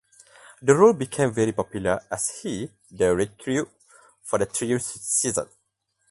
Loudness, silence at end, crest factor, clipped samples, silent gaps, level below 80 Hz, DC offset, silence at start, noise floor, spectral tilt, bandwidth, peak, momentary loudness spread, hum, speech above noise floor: -24 LUFS; 0.65 s; 22 dB; under 0.1%; none; -54 dBFS; under 0.1%; 0.6 s; -73 dBFS; -4.5 dB/octave; 12 kHz; -2 dBFS; 14 LU; none; 50 dB